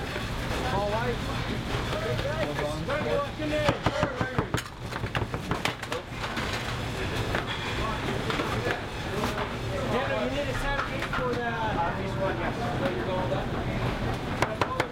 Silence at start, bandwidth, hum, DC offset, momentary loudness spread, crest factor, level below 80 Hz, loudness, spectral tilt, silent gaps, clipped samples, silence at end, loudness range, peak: 0 s; 16.5 kHz; none; under 0.1%; 4 LU; 18 dB; -40 dBFS; -29 LUFS; -5.5 dB/octave; none; under 0.1%; 0 s; 2 LU; -10 dBFS